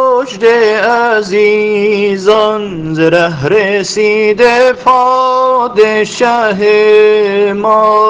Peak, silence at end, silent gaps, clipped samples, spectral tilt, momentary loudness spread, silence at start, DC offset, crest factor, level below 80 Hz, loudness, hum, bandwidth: 0 dBFS; 0 s; none; 0.6%; -4.5 dB/octave; 4 LU; 0 s; under 0.1%; 8 dB; -48 dBFS; -9 LUFS; none; 9.4 kHz